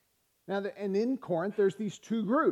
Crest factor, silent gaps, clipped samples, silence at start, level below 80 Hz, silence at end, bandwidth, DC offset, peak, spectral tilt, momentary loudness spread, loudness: 16 dB; none; under 0.1%; 0.5 s; -80 dBFS; 0 s; 11 kHz; under 0.1%; -16 dBFS; -7 dB/octave; 7 LU; -32 LUFS